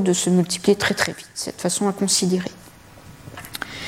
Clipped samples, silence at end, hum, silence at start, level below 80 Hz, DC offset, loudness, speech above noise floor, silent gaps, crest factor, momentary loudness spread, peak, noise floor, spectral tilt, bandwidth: under 0.1%; 0 s; none; 0 s; -54 dBFS; under 0.1%; -21 LUFS; 24 dB; none; 20 dB; 15 LU; -2 dBFS; -44 dBFS; -4 dB/octave; 16.5 kHz